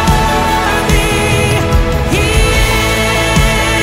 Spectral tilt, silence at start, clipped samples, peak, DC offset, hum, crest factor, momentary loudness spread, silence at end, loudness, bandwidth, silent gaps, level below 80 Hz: -4.5 dB/octave; 0 s; under 0.1%; 0 dBFS; under 0.1%; none; 10 dB; 2 LU; 0 s; -11 LUFS; 16.5 kHz; none; -16 dBFS